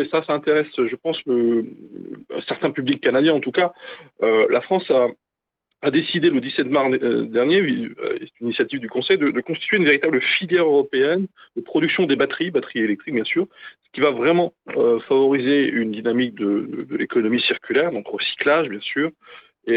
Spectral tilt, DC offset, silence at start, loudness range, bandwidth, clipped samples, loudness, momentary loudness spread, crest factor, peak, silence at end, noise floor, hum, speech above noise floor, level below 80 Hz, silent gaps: -9 dB/octave; under 0.1%; 0 s; 3 LU; 5 kHz; under 0.1%; -20 LUFS; 9 LU; 16 dB; -4 dBFS; 0 s; -80 dBFS; none; 60 dB; -70 dBFS; none